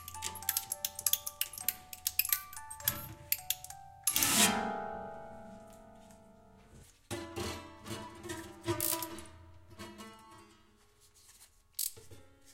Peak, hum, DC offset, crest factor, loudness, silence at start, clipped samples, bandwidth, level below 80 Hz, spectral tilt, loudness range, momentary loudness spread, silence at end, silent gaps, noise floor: -8 dBFS; none; under 0.1%; 30 dB; -34 LUFS; 0 s; under 0.1%; 17 kHz; -64 dBFS; -1.5 dB/octave; 14 LU; 22 LU; 0 s; none; -65 dBFS